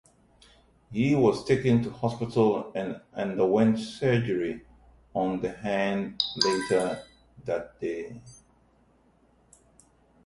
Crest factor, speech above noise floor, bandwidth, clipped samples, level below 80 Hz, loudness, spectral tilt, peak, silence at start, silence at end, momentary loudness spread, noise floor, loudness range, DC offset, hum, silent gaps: 22 dB; 37 dB; 11.5 kHz; under 0.1%; -58 dBFS; -27 LUFS; -6 dB/octave; -8 dBFS; 0.9 s; 1.95 s; 12 LU; -63 dBFS; 7 LU; under 0.1%; none; none